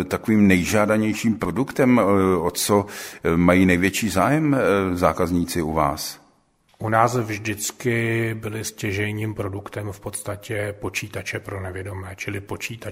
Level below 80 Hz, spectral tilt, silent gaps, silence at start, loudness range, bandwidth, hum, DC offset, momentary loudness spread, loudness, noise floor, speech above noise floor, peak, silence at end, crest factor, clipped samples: -46 dBFS; -5.5 dB/octave; none; 0 s; 9 LU; 16 kHz; none; under 0.1%; 14 LU; -22 LUFS; -61 dBFS; 39 dB; -2 dBFS; 0 s; 20 dB; under 0.1%